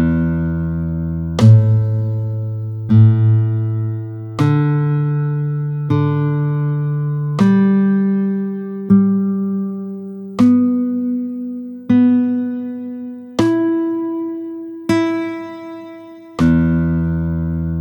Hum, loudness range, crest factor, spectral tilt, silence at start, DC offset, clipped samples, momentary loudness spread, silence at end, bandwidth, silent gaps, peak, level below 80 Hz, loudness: none; 5 LU; 16 dB; -9 dB/octave; 0 s; under 0.1%; under 0.1%; 14 LU; 0 s; 8.2 kHz; none; 0 dBFS; -38 dBFS; -17 LUFS